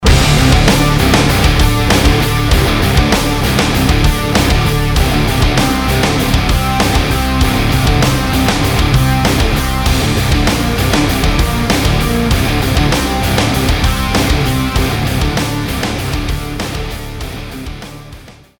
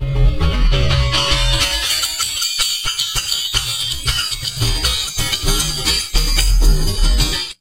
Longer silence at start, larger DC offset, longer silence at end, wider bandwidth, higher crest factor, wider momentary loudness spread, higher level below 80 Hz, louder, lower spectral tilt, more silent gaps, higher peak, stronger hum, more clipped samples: about the same, 0 s vs 0 s; neither; first, 0.3 s vs 0.05 s; first, over 20 kHz vs 16 kHz; about the same, 12 dB vs 16 dB; first, 8 LU vs 3 LU; about the same, -18 dBFS vs -18 dBFS; first, -13 LUFS vs -16 LUFS; first, -5 dB/octave vs -2.5 dB/octave; neither; about the same, 0 dBFS vs 0 dBFS; neither; neither